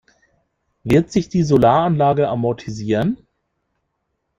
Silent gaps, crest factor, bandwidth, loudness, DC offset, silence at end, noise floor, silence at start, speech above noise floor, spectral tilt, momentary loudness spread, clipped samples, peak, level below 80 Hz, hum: none; 18 dB; 14.5 kHz; -17 LUFS; under 0.1%; 1.25 s; -73 dBFS; 0.85 s; 57 dB; -7.5 dB/octave; 11 LU; under 0.1%; -2 dBFS; -46 dBFS; none